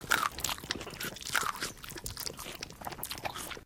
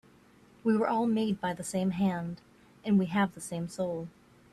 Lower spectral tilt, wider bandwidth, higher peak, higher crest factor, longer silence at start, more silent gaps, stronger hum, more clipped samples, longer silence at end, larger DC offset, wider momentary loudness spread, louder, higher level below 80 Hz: second, -1.5 dB/octave vs -6.5 dB/octave; first, 17 kHz vs 13 kHz; first, -8 dBFS vs -16 dBFS; first, 28 dB vs 16 dB; second, 0 s vs 0.65 s; neither; neither; neither; second, 0 s vs 0.45 s; neither; second, 10 LU vs 13 LU; second, -36 LUFS vs -31 LUFS; first, -56 dBFS vs -66 dBFS